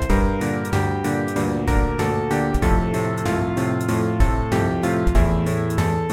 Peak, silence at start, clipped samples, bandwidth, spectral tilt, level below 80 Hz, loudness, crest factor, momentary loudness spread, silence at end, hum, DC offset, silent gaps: -4 dBFS; 0 s; under 0.1%; 16 kHz; -7 dB/octave; -24 dBFS; -21 LUFS; 16 dB; 3 LU; 0 s; none; under 0.1%; none